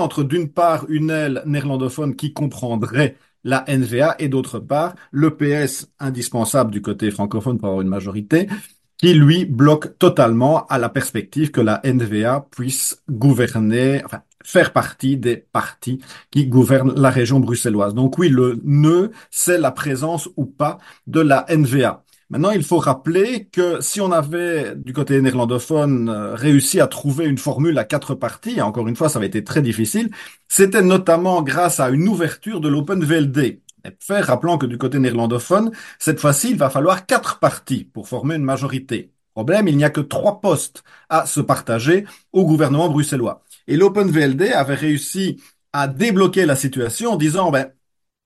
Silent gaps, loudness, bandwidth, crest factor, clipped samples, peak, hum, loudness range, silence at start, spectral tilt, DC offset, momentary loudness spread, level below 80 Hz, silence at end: none; -18 LUFS; 12.5 kHz; 18 dB; under 0.1%; 0 dBFS; none; 4 LU; 0 s; -5.5 dB/octave; under 0.1%; 9 LU; -56 dBFS; 0.6 s